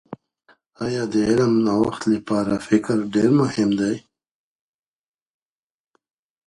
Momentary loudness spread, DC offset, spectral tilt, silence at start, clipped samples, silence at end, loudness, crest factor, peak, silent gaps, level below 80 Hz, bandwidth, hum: 11 LU; under 0.1%; -6.5 dB/octave; 0.1 s; under 0.1%; 2.5 s; -20 LUFS; 18 dB; -4 dBFS; none; -56 dBFS; 11.5 kHz; none